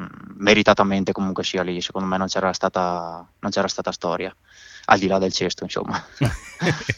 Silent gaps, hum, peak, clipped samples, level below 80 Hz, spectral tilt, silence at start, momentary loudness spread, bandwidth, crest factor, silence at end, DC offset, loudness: none; none; 0 dBFS; under 0.1%; -48 dBFS; -4.5 dB/octave; 0 s; 12 LU; 13 kHz; 22 dB; 0 s; under 0.1%; -22 LUFS